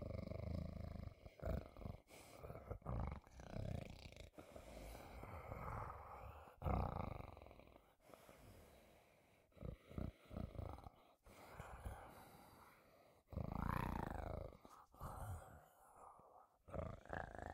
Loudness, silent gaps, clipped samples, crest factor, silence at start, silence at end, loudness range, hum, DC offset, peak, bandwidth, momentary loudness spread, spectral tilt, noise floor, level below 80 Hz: -52 LUFS; none; under 0.1%; 24 dB; 0 s; 0 s; 6 LU; none; under 0.1%; -28 dBFS; 16 kHz; 19 LU; -7 dB/octave; -73 dBFS; -58 dBFS